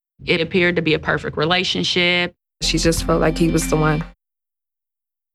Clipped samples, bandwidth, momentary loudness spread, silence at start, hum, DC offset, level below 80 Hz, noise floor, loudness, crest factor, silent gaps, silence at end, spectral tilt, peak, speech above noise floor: under 0.1%; 15 kHz; 6 LU; 0.2 s; none; under 0.1%; -34 dBFS; -87 dBFS; -18 LUFS; 16 dB; none; 1.25 s; -4.5 dB/octave; -4 dBFS; 69 dB